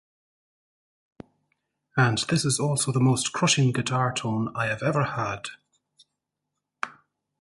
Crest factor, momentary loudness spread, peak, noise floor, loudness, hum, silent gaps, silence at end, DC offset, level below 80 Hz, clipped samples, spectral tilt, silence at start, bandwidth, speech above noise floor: 20 dB; 14 LU; -8 dBFS; -83 dBFS; -24 LUFS; 50 Hz at -50 dBFS; none; 0.5 s; under 0.1%; -60 dBFS; under 0.1%; -4.5 dB/octave; 1.95 s; 11.5 kHz; 59 dB